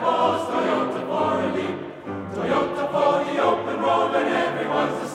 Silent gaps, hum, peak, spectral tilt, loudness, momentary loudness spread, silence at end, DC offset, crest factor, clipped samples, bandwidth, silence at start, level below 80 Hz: none; none; -8 dBFS; -5.5 dB/octave; -23 LUFS; 8 LU; 0 s; under 0.1%; 16 dB; under 0.1%; 13 kHz; 0 s; -60 dBFS